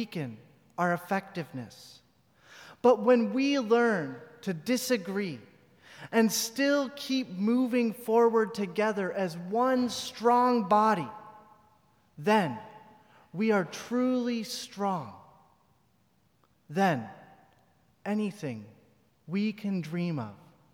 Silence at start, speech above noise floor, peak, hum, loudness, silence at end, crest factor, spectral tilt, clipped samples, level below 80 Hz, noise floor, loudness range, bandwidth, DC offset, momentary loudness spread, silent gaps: 0 s; 41 dB; -12 dBFS; none; -29 LUFS; 0.4 s; 18 dB; -5 dB/octave; under 0.1%; -78 dBFS; -69 dBFS; 8 LU; 18.5 kHz; under 0.1%; 17 LU; none